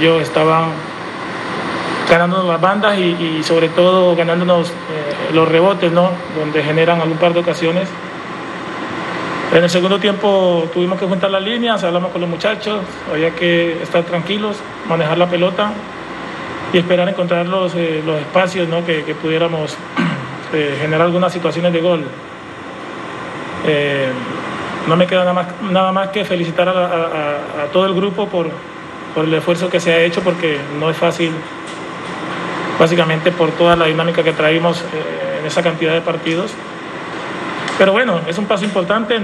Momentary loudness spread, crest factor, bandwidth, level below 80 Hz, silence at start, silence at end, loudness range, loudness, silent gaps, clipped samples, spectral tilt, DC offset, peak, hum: 12 LU; 16 dB; 12 kHz; -54 dBFS; 0 s; 0 s; 4 LU; -16 LUFS; none; under 0.1%; -6 dB/octave; under 0.1%; 0 dBFS; none